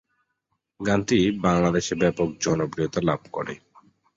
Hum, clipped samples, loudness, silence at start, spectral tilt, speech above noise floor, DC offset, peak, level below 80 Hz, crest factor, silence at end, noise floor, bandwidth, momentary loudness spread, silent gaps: none; under 0.1%; -24 LUFS; 0.8 s; -5.5 dB/octave; 54 dB; under 0.1%; -6 dBFS; -50 dBFS; 18 dB; 0.6 s; -77 dBFS; 8 kHz; 12 LU; none